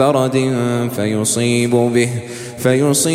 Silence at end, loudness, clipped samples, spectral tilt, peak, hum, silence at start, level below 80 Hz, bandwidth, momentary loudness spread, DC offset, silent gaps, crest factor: 0 s; -16 LUFS; under 0.1%; -5 dB/octave; 0 dBFS; none; 0 s; -54 dBFS; 16.5 kHz; 6 LU; under 0.1%; none; 14 dB